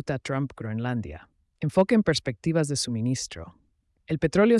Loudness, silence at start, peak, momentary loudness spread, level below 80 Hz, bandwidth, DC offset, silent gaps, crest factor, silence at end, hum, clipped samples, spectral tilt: -26 LUFS; 0.05 s; -8 dBFS; 16 LU; -54 dBFS; 12 kHz; under 0.1%; none; 18 dB; 0 s; none; under 0.1%; -5.5 dB/octave